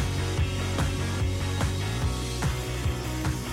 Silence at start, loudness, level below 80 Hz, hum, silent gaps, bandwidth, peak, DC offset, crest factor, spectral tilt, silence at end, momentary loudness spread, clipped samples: 0 s; -29 LUFS; -34 dBFS; none; none; 16 kHz; -16 dBFS; under 0.1%; 12 dB; -5 dB/octave; 0 s; 2 LU; under 0.1%